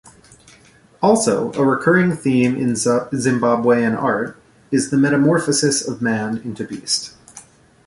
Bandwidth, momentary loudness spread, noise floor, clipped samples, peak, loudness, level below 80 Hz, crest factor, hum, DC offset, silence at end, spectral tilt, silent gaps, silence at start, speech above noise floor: 11.5 kHz; 8 LU; -50 dBFS; under 0.1%; -2 dBFS; -18 LUFS; -56 dBFS; 16 dB; none; under 0.1%; 0.45 s; -4.5 dB/octave; none; 0.05 s; 33 dB